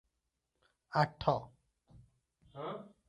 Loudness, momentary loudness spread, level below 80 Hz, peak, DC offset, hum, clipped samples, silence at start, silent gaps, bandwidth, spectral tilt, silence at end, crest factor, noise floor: -36 LUFS; 21 LU; -64 dBFS; -14 dBFS; under 0.1%; none; under 0.1%; 0.9 s; none; 11 kHz; -7 dB/octave; 0.2 s; 26 dB; -85 dBFS